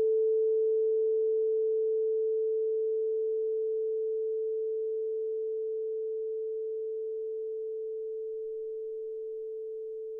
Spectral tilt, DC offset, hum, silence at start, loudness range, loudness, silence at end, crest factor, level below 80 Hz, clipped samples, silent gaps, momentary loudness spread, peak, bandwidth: -8.5 dB/octave; under 0.1%; none; 0 s; 8 LU; -32 LUFS; 0 s; 8 dB; -82 dBFS; under 0.1%; none; 10 LU; -22 dBFS; 0.9 kHz